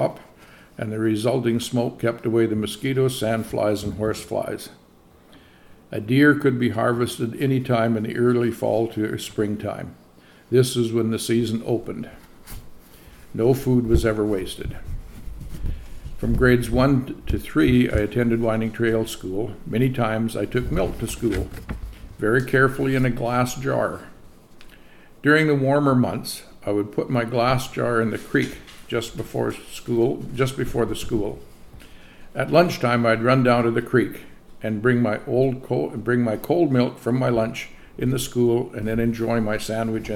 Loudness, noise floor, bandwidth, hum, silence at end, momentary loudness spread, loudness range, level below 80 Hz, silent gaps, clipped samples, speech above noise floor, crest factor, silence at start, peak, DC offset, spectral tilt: -22 LUFS; -52 dBFS; 17 kHz; none; 0 s; 15 LU; 4 LU; -38 dBFS; none; under 0.1%; 30 dB; 20 dB; 0 s; -2 dBFS; under 0.1%; -6.5 dB/octave